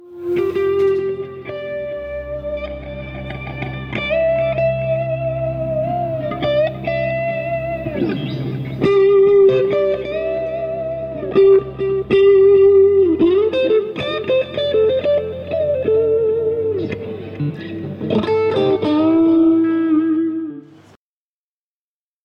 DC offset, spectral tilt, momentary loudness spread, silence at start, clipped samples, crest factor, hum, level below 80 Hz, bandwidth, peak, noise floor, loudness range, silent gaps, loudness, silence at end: under 0.1%; -8.5 dB/octave; 15 LU; 0 s; under 0.1%; 12 dB; none; -44 dBFS; 5.6 kHz; -4 dBFS; under -90 dBFS; 8 LU; none; -17 LUFS; 1.65 s